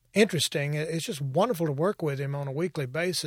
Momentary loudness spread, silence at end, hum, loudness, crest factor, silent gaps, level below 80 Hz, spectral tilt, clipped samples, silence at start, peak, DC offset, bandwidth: 7 LU; 0 s; none; -28 LUFS; 18 dB; none; -68 dBFS; -5 dB/octave; under 0.1%; 0.15 s; -8 dBFS; under 0.1%; 17 kHz